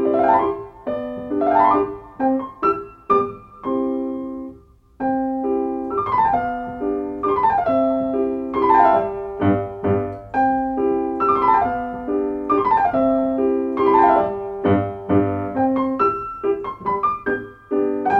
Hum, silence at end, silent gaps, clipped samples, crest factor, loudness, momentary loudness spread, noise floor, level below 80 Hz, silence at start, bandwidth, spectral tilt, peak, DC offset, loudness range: none; 0 s; none; under 0.1%; 16 dB; -20 LUFS; 10 LU; -46 dBFS; -48 dBFS; 0 s; 5.4 kHz; -9.5 dB/octave; -2 dBFS; under 0.1%; 5 LU